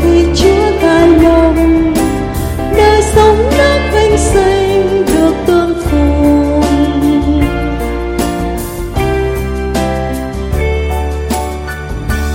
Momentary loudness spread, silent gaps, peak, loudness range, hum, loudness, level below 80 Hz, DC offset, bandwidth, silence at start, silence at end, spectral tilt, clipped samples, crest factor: 9 LU; none; 0 dBFS; 7 LU; none; -11 LUFS; -20 dBFS; under 0.1%; 16.5 kHz; 0 s; 0 s; -6 dB/octave; under 0.1%; 10 dB